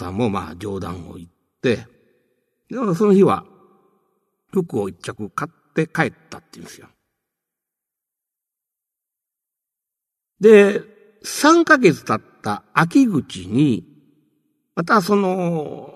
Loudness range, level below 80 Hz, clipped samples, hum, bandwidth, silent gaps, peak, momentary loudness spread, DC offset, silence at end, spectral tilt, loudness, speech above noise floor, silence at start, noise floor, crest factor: 12 LU; -60 dBFS; under 0.1%; none; 13.5 kHz; none; 0 dBFS; 18 LU; under 0.1%; 0.05 s; -6 dB/octave; -18 LUFS; 67 dB; 0 s; -85 dBFS; 20 dB